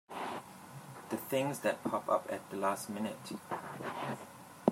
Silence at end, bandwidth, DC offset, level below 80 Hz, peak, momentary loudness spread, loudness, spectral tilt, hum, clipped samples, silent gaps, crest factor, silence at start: 0 s; 16 kHz; under 0.1%; -80 dBFS; -10 dBFS; 15 LU; -38 LUFS; -5 dB/octave; none; under 0.1%; none; 26 dB; 0.1 s